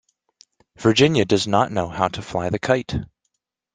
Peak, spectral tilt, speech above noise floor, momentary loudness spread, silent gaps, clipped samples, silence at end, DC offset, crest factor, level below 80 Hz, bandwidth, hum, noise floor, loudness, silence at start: -2 dBFS; -5 dB/octave; 56 dB; 9 LU; none; under 0.1%; 0.7 s; under 0.1%; 20 dB; -48 dBFS; 9.8 kHz; none; -76 dBFS; -20 LUFS; 0.8 s